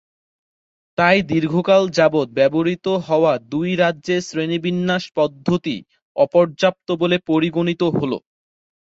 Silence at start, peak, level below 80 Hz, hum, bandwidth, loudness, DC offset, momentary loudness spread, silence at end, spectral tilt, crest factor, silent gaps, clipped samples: 1 s; -2 dBFS; -58 dBFS; none; 7.8 kHz; -18 LUFS; under 0.1%; 7 LU; 0.65 s; -6 dB/octave; 18 dB; 6.02-6.15 s; under 0.1%